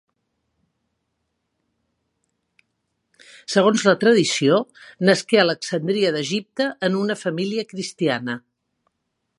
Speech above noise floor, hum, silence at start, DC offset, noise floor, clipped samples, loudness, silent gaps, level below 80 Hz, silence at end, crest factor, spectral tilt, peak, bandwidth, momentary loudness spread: 56 dB; none; 3.5 s; under 0.1%; -76 dBFS; under 0.1%; -20 LUFS; none; -72 dBFS; 1 s; 22 dB; -4.5 dB/octave; 0 dBFS; 11.5 kHz; 10 LU